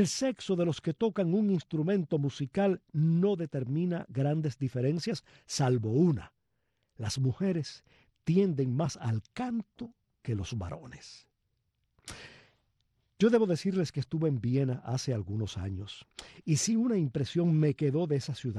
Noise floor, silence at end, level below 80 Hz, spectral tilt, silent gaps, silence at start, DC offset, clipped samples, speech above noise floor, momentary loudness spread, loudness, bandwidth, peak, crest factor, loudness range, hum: -79 dBFS; 0 s; -62 dBFS; -6.5 dB/octave; none; 0 s; under 0.1%; under 0.1%; 49 dB; 15 LU; -31 LUFS; 12.5 kHz; -12 dBFS; 18 dB; 7 LU; none